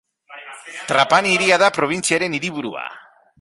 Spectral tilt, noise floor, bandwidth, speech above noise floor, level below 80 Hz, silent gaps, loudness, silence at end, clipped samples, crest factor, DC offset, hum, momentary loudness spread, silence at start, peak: -3 dB/octave; -40 dBFS; 11.5 kHz; 22 dB; -62 dBFS; none; -17 LUFS; 0.4 s; under 0.1%; 18 dB; under 0.1%; none; 20 LU; 0.3 s; -2 dBFS